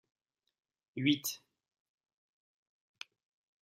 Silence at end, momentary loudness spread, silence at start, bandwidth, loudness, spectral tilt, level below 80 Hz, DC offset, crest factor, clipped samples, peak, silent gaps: 2.25 s; 20 LU; 0.95 s; 14.5 kHz; -34 LUFS; -3.5 dB/octave; -86 dBFS; under 0.1%; 26 dB; under 0.1%; -16 dBFS; none